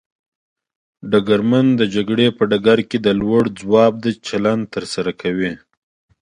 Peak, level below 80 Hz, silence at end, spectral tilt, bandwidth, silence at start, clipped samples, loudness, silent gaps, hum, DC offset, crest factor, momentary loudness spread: 0 dBFS; -52 dBFS; 0.65 s; -6.5 dB/octave; 10.5 kHz; 1.05 s; under 0.1%; -17 LUFS; none; none; under 0.1%; 18 dB; 9 LU